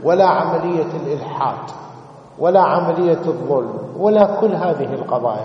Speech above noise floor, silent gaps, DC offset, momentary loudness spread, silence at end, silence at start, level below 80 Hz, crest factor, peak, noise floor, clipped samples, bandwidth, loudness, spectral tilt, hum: 22 dB; none; under 0.1%; 11 LU; 0 s; 0 s; -62 dBFS; 18 dB; 0 dBFS; -39 dBFS; under 0.1%; 7.6 kHz; -17 LUFS; -8 dB/octave; none